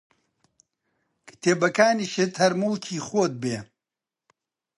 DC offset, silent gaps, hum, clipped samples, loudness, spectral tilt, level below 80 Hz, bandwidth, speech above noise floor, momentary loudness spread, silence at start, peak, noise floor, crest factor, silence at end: under 0.1%; none; none; under 0.1%; -24 LUFS; -4.5 dB/octave; -70 dBFS; 11.5 kHz; 66 dB; 10 LU; 1.25 s; -4 dBFS; -89 dBFS; 22 dB; 1.15 s